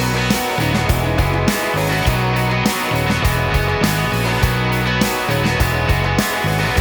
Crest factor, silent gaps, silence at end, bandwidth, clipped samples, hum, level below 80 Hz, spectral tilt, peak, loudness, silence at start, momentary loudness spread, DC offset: 16 dB; none; 0 s; over 20 kHz; under 0.1%; none; -26 dBFS; -5 dB/octave; 0 dBFS; -17 LUFS; 0 s; 1 LU; under 0.1%